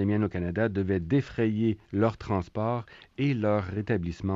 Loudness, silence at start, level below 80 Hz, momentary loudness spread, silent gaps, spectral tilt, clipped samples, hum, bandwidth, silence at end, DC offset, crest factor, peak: -28 LUFS; 0 s; -54 dBFS; 5 LU; none; -9 dB/octave; under 0.1%; none; 7.6 kHz; 0 s; under 0.1%; 14 dB; -12 dBFS